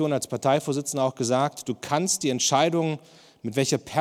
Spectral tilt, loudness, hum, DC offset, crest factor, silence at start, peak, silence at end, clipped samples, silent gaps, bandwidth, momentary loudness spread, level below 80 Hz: -4 dB/octave; -25 LUFS; none; under 0.1%; 18 dB; 0 s; -6 dBFS; 0 s; under 0.1%; none; 16.5 kHz; 8 LU; -68 dBFS